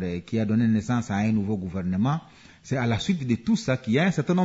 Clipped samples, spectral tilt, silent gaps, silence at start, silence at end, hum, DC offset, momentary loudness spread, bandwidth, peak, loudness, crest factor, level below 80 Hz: under 0.1%; -7 dB/octave; none; 0 s; 0 s; none; under 0.1%; 6 LU; 8 kHz; -10 dBFS; -25 LUFS; 14 dB; -56 dBFS